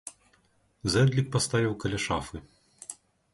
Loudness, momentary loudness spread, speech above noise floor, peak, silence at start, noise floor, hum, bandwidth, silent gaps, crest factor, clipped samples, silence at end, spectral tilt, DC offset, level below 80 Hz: -27 LUFS; 20 LU; 40 dB; -12 dBFS; 0.05 s; -67 dBFS; none; 11.5 kHz; none; 18 dB; under 0.1%; 0.4 s; -5 dB/octave; under 0.1%; -52 dBFS